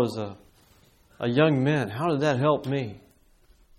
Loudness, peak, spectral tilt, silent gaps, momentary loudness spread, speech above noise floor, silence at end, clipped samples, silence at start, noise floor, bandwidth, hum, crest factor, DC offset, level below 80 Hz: -25 LUFS; -8 dBFS; -7 dB/octave; none; 13 LU; 34 dB; 0.8 s; under 0.1%; 0 s; -59 dBFS; 13.5 kHz; none; 18 dB; under 0.1%; -62 dBFS